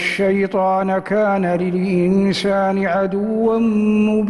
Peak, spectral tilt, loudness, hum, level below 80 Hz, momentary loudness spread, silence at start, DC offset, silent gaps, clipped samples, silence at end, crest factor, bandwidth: -6 dBFS; -7 dB/octave; -17 LUFS; none; -50 dBFS; 3 LU; 0 s; under 0.1%; none; under 0.1%; 0 s; 10 dB; 11.5 kHz